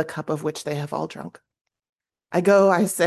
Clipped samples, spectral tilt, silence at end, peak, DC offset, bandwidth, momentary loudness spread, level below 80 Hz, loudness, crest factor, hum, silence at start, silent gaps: under 0.1%; -5.5 dB/octave; 0 s; -4 dBFS; under 0.1%; 12.5 kHz; 17 LU; -68 dBFS; -22 LUFS; 18 dB; none; 0 s; 1.89-1.96 s